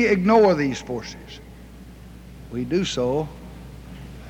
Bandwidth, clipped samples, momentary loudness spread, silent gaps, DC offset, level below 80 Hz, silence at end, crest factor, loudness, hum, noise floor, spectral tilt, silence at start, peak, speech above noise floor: 16 kHz; under 0.1%; 27 LU; none; under 0.1%; -44 dBFS; 0 s; 18 dB; -21 LUFS; none; -42 dBFS; -6 dB/octave; 0 s; -6 dBFS; 21 dB